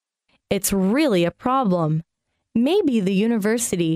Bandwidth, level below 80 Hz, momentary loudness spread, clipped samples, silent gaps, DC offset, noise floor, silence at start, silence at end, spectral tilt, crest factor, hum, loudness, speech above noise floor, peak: 16 kHz; -52 dBFS; 6 LU; under 0.1%; none; under 0.1%; -68 dBFS; 0.5 s; 0 s; -5.5 dB/octave; 14 dB; none; -21 LUFS; 49 dB; -8 dBFS